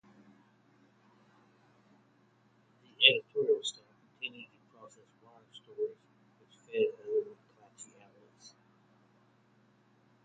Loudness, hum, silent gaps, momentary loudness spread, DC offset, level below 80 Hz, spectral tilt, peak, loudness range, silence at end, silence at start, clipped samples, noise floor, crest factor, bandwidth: -31 LUFS; none; none; 30 LU; under 0.1%; -88 dBFS; -1.5 dB/octave; -6 dBFS; 9 LU; 1.75 s; 3 s; under 0.1%; -68 dBFS; 32 dB; 9 kHz